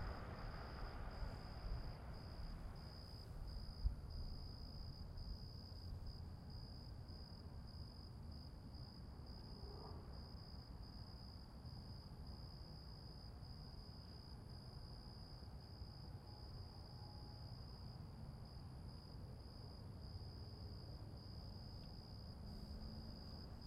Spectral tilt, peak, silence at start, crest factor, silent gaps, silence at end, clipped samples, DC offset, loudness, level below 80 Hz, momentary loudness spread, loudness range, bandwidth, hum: -6.5 dB/octave; -28 dBFS; 0 s; 24 dB; none; 0 s; under 0.1%; under 0.1%; -55 LUFS; -56 dBFS; 4 LU; 4 LU; 15.5 kHz; none